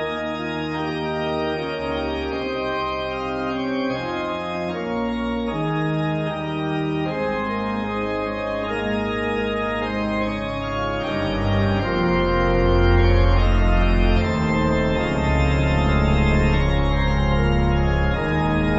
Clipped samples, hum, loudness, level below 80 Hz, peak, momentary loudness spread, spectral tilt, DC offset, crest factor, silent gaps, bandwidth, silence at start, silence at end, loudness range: under 0.1%; none; -22 LUFS; -26 dBFS; -6 dBFS; 7 LU; -7.5 dB/octave; under 0.1%; 16 dB; none; 8 kHz; 0 s; 0 s; 6 LU